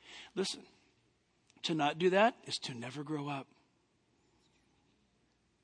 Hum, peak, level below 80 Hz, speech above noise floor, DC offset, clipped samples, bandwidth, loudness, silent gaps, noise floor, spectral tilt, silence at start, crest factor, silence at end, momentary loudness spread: none; -14 dBFS; -82 dBFS; 40 dB; under 0.1%; under 0.1%; 10.5 kHz; -35 LUFS; none; -75 dBFS; -4.5 dB/octave; 0.05 s; 24 dB; 2.2 s; 15 LU